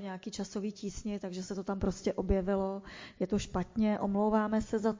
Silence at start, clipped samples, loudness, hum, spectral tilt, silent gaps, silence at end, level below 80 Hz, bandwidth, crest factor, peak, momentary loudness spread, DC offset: 0 s; under 0.1%; -34 LUFS; none; -6.5 dB/octave; none; 0 s; -48 dBFS; 7.6 kHz; 16 dB; -16 dBFS; 10 LU; under 0.1%